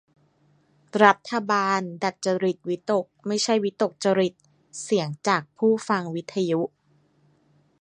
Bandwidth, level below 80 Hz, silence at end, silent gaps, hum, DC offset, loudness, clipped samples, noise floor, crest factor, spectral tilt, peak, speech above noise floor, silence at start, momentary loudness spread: 11 kHz; -76 dBFS; 1.15 s; none; none; under 0.1%; -24 LUFS; under 0.1%; -63 dBFS; 24 dB; -4.5 dB/octave; 0 dBFS; 39 dB; 0.95 s; 10 LU